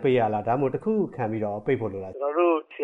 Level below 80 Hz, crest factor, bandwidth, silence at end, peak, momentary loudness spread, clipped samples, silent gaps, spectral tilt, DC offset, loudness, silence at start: -62 dBFS; 16 dB; 4 kHz; 0 s; -10 dBFS; 6 LU; under 0.1%; none; -9.5 dB/octave; under 0.1%; -26 LUFS; 0 s